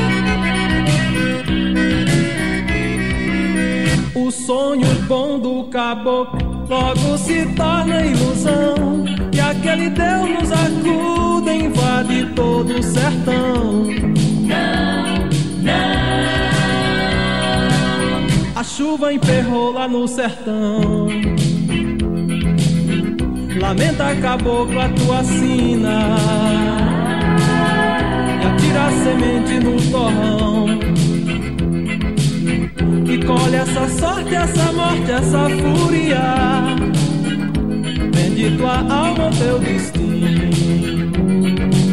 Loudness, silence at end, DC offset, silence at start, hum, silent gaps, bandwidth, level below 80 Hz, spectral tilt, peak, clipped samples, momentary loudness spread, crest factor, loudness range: -16 LUFS; 0 s; 2%; 0 s; none; none; 12.5 kHz; -30 dBFS; -5.5 dB/octave; -2 dBFS; under 0.1%; 4 LU; 14 dB; 2 LU